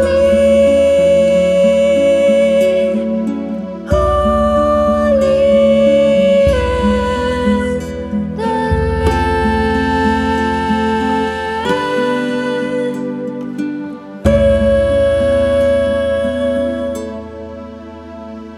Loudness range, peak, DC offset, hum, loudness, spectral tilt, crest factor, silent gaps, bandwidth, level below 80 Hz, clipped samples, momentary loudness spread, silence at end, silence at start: 5 LU; 0 dBFS; under 0.1%; none; -14 LUFS; -6.5 dB/octave; 14 dB; none; 12 kHz; -28 dBFS; under 0.1%; 12 LU; 0 s; 0 s